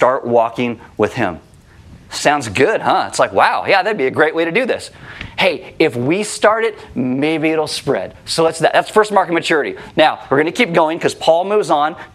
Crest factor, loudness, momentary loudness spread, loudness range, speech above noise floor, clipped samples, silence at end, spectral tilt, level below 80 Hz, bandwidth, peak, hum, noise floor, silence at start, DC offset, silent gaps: 16 dB; -15 LUFS; 8 LU; 2 LU; 26 dB; under 0.1%; 0.1 s; -4 dB/octave; -52 dBFS; 14.5 kHz; 0 dBFS; none; -41 dBFS; 0 s; under 0.1%; none